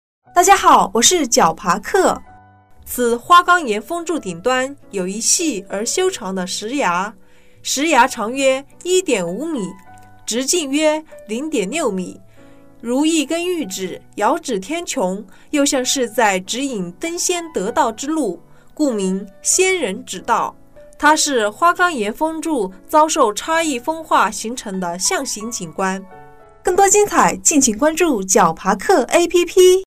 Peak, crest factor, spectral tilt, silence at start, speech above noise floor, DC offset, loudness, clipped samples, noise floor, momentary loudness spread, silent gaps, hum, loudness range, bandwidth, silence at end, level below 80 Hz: 0 dBFS; 16 dB; -2.5 dB/octave; 0.35 s; 28 dB; under 0.1%; -17 LUFS; under 0.1%; -45 dBFS; 12 LU; none; none; 6 LU; 16 kHz; 0 s; -48 dBFS